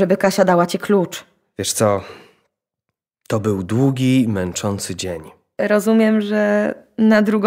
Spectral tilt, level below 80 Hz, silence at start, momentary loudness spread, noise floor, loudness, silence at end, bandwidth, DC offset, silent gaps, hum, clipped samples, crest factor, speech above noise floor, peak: -5.5 dB/octave; -56 dBFS; 0 s; 12 LU; -80 dBFS; -18 LUFS; 0 s; 16 kHz; under 0.1%; none; none; under 0.1%; 16 dB; 63 dB; -2 dBFS